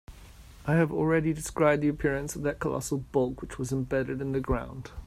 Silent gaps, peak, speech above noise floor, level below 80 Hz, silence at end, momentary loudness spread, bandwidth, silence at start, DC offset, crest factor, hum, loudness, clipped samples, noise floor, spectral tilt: none; -10 dBFS; 21 dB; -44 dBFS; 0 s; 7 LU; 15 kHz; 0.1 s; under 0.1%; 18 dB; none; -29 LUFS; under 0.1%; -49 dBFS; -6.5 dB/octave